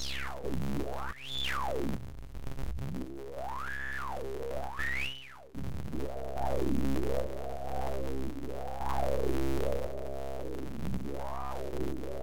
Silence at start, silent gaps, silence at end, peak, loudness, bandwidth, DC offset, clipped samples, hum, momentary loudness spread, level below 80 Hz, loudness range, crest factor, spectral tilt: 0 s; none; 0 s; -18 dBFS; -37 LUFS; 17 kHz; 2%; under 0.1%; none; 8 LU; -44 dBFS; 3 LU; 16 dB; -5.5 dB/octave